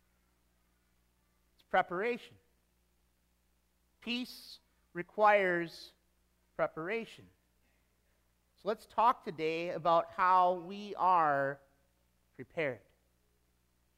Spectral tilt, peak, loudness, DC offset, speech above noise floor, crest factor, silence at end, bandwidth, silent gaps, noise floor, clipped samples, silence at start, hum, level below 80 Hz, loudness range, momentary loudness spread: -5.5 dB/octave; -14 dBFS; -32 LUFS; under 0.1%; 43 dB; 22 dB; 1.2 s; 16 kHz; none; -75 dBFS; under 0.1%; 1.75 s; 60 Hz at -75 dBFS; -74 dBFS; 9 LU; 20 LU